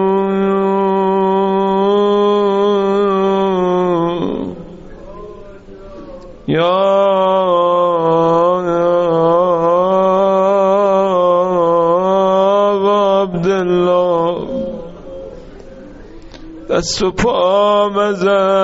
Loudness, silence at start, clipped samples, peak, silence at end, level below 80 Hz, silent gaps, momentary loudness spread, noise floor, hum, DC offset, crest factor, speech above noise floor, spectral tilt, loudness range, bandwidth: -13 LUFS; 0 s; under 0.1%; -2 dBFS; 0 s; -42 dBFS; none; 16 LU; -34 dBFS; none; under 0.1%; 12 dB; 21 dB; -5 dB/octave; 7 LU; 8 kHz